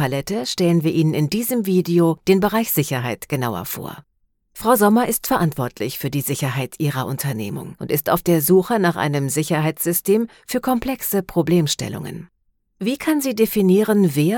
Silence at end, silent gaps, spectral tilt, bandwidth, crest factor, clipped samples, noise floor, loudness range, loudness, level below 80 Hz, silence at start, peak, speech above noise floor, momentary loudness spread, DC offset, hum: 0 s; none; -5.5 dB/octave; 18 kHz; 16 dB; under 0.1%; -55 dBFS; 3 LU; -19 LUFS; -50 dBFS; 0 s; -2 dBFS; 36 dB; 10 LU; under 0.1%; none